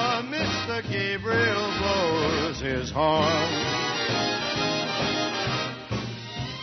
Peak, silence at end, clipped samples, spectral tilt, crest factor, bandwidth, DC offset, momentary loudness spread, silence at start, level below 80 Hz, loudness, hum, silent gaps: -10 dBFS; 0 s; under 0.1%; -4 dB/octave; 16 dB; 6.4 kHz; under 0.1%; 7 LU; 0 s; -50 dBFS; -25 LUFS; none; none